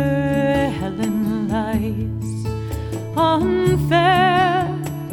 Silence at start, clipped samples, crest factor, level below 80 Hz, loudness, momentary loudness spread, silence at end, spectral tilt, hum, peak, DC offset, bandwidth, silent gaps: 0 s; under 0.1%; 14 dB; -36 dBFS; -19 LUFS; 11 LU; 0 s; -6.5 dB/octave; none; -4 dBFS; under 0.1%; 19 kHz; none